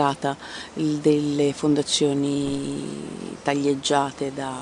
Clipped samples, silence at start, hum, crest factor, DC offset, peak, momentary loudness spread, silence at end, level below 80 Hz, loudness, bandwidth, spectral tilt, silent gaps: under 0.1%; 0 s; none; 18 dB; under 0.1%; -6 dBFS; 12 LU; 0 s; -58 dBFS; -24 LUFS; 11 kHz; -4.5 dB/octave; none